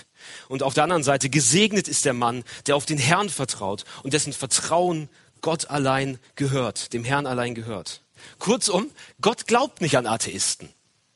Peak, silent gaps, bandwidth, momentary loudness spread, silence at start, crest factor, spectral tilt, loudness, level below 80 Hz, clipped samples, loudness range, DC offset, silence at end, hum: 0 dBFS; none; 11.5 kHz; 12 LU; 0.2 s; 24 dB; -3.5 dB/octave; -23 LUFS; -60 dBFS; under 0.1%; 5 LU; under 0.1%; 0.5 s; none